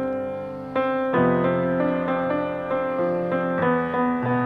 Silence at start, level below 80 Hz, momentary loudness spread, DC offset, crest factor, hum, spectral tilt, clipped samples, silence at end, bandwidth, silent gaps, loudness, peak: 0 s; -56 dBFS; 7 LU; under 0.1%; 14 dB; none; -9.5 dB/octave; under 0.1%; 0 s; 4.9 kHz; none; -23 LUFS; -10 dBFS